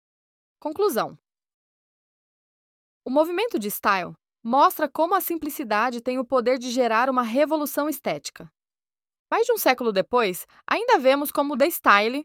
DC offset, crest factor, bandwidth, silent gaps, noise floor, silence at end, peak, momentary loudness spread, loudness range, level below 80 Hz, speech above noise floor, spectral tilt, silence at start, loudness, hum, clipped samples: under 0.1%; 20 dB; 19 kHz; 1.54-3.01 s, 9.19-9.26 s; under -90 dBFS; 0 s; -4 dBFS; 10 LU; 5 LU; -68 dBFS; over 68 dB; -3.5 dB/octave; 0.65 s; -23 LUFS; none; under 0.1%